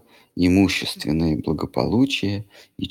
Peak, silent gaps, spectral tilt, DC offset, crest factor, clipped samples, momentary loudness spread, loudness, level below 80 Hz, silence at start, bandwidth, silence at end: -2 dBFS; none; -6 dB/octave; under 0.1%; 20 dB; under 0.1%; 15 LU; -21 LUFS; -42 dBFS; 0.35 s; 16 kHz; 0 s